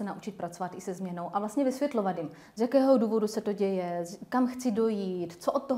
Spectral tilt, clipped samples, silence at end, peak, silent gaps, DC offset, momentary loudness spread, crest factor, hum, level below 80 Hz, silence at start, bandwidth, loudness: -6.5 dB/octave; under 0.1%; 0 s; -12 dBFS; none; under 0.1%; 12 LU; 18 dB; none; -72 dBFS; 0 s; 16 kHz; -30 LUFS